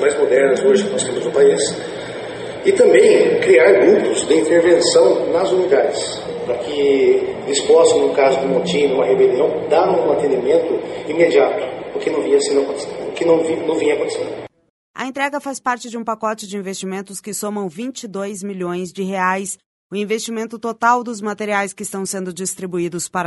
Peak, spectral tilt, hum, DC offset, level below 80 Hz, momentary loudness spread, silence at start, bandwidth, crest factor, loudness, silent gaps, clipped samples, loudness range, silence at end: 0 dBFS; -4 dB/octave; none; under 0.1%; -58 dBFS; 14 LU; 0 s; 11.5 kHz; 16 dB; -17 LUFS; 14.70-14.94 s, 19.66-19.90 s; under 0.1%; 11 LU; 0 s